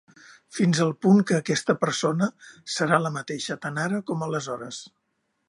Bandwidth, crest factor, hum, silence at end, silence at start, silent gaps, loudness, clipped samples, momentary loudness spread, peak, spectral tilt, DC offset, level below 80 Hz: 11.5 kHz; 20 dB; none; 0.6 s; 0.3 s; none; -25 LUFS; under 0.1%; 14 LU; -4 dBFS; -5 dB/octave; under 0.1%; -70 dBFS